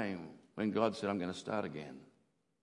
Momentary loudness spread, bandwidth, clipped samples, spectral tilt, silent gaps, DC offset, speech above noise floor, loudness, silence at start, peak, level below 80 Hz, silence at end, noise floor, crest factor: 17 LU; 11 kHz; under 0.1%; -6 dB/octave; none; under 0.1%; 39 dB; -38 LUFS; 0 s; -18 dBFS; -80 dBFS; 0.55 s; -76 dBFS; 22 dB